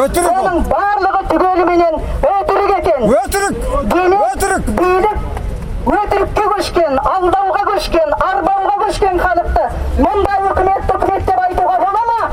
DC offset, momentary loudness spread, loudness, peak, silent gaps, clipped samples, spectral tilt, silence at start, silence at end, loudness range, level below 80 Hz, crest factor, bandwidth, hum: under 0.1%; 4 LU; -14 LUFS; 0 dBFS; none; under 0.1%; -5.5 dB/octave; 0 s; 0 s; 1 LU; -24 dBFS; 14 dB; 16 kHz; none